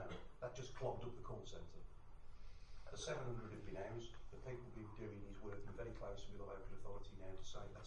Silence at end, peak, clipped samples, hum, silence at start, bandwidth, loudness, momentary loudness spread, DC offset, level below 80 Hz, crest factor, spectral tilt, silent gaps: 0 s; -30 dBFS; under 0.1%; none; 0 s; 9.8 kHz; -53 LUFS; 15 LU; under 0.1%; -58 dBFS; 18 dB; -5.5 dB/octave; none